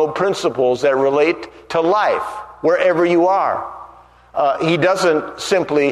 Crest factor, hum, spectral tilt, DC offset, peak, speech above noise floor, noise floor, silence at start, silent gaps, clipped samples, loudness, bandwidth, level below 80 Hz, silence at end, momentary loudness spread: 14 dB; 60 Hz at -50 dBFS; -5 dB/octave; under 0.1%; -2 dBFS; 28 dB; -44 dBFS; 0 s; none; under 0.1%; -17 LUFS; 13 kHz; -56 dBFS; 0 s; 10 LU